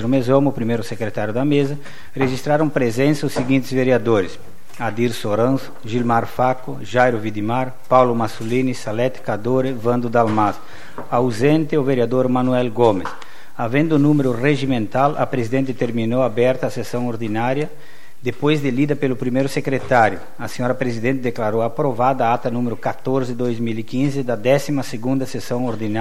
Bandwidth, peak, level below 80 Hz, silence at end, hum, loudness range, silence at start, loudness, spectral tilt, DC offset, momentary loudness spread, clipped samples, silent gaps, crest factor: 15.5 kHz; 0 dBFS; -56 dBFS; 0 s; none; 3 LU; 0 s; -19 LUFS; -7 dB/octave; 5%; 8 LU; under 0.1%; none; 18 dB